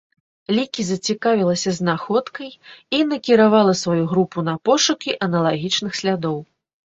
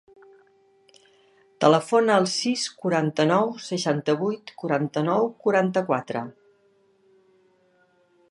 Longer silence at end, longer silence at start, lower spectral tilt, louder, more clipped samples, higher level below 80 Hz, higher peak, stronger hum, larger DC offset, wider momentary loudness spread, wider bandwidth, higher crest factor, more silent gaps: second, 0.45 s vs 2 s; second, 0.5 s vs 1.6 s; about the same, -4.5 dB/octave vs -5 dB/octave; first, -19 LUFS vs -23 LUFS; neither; first, -60 dBFS vs -76 dBFS; about the same, -2 dBFS vs -4 dBFS; neither; neither; about the same, 9 LU vs 8 LU; second, 8 kHz vs 11.5 kHz; about the same, 18 dB vs 22 dB; neither